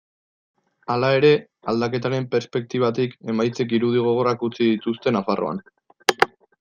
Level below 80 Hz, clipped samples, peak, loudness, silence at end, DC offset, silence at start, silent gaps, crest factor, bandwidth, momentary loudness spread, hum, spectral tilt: -64 dBFS; under 0.1%; 0 dBFS; -22 LUFS; 0.35 s; under 0.1%; 0.9 s; none; 22 dB; 15.5 kHz; 8 LU; none; -6 dB/octave